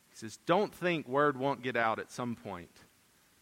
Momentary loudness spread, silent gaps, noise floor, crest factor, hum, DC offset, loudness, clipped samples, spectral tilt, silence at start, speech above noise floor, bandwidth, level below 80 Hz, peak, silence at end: 14 LU; none; -67 dBFS; 22 dB; none; under 0.1%; -32 LUFS; under 0.1%; -5.5 dB/octave; 0.15 s; 34 dB; 16.5 kHz; -74 dBFS; -12 dBFS; 0.75 s